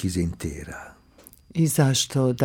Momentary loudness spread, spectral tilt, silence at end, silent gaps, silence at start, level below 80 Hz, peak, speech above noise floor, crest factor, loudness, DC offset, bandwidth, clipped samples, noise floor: 17 LU; -5 dB/octave; 0 s; none; 0 s; -46 dBFS; -8 dBFS; 29 dB; 18 dB; -23 LUFS; under 0.1%; 18.5 kHz; under 0.1%; -52 dBFS